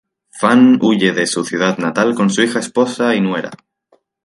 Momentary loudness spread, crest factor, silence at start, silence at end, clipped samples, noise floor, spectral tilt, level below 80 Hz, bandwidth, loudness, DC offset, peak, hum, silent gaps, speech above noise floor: 8 LU; 14 dB; 0.35 s; 0.7 s; under 0.1%; -58 dBFS; -5 dB/octave; -62 dBFS; 11.5 kHz; -14 LUFS; under 0.1%; 0 dBFS; none; none; 44 dB